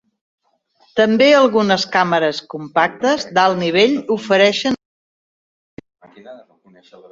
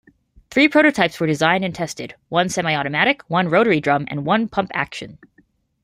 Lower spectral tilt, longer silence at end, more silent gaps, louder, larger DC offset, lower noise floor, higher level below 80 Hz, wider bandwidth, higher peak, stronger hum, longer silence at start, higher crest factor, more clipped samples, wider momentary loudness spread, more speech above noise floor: about the same, -4.5 dB/octave vs -5 dB/octave; about the same, 0.75 s vs 0.7 s; first, 4.85-5.77 s vs none; first, -15 LUFS vs -18 LUFS; neither; about the same, -59 dBFS vs -59 dBFS; about the same, -60 dBFS vs -56 dBFS; second, 7.8 kHz vs 15.5 kHz; about the same, -2 dBFS vs -2 dBFS; neither; first, 0.95 s vs 0.5 s; about the same, 16 dB vs 18 dB; neither; about the same, 10 LU vs 12 LU; about the same, 43 dB vs 40 dB